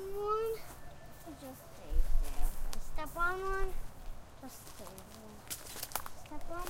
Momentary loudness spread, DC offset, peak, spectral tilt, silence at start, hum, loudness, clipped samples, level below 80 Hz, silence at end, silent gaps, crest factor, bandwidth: 17 LU; under 0.1%; -16 dBFS; -4 dB/octave; 0 s; none; -40 LUFS; under 0.1%; -38 dBFS; 0 s; none; 18 dB; 16.5 kHz